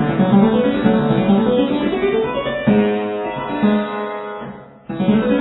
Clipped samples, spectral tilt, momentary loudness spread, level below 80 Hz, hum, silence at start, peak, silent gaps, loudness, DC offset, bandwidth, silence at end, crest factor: under 0.1%; -11 dB/octave; 12 LU; -44 dBFS; none; 0 s; 0 dBFS; none; -17 LUFS; under 0.1%; 4.1 kHz; 0 s; 16 dB